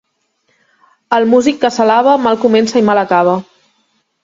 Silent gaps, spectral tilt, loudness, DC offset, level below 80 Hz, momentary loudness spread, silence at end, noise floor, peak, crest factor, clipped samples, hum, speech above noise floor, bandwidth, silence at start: none; -5 dB/octave; -12 LUFS; under 0.1%; -56 dBFS; 5 LU; 0.8 s; -62 dBFS; 0 dBFS; 14 dB; under 0.1%; none; 52 dB; 7.8 kHz; 1.1 s